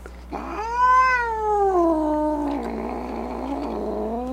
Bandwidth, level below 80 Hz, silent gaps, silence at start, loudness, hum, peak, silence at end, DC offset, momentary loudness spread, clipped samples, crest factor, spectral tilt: 15 kHz; -40 dBFS; none; 0 s; -22 LUFS; none; -10 dBFS; 0 s; under 0.1%; 13 LU; under 0.1%; 14 dB; -6 dB/octave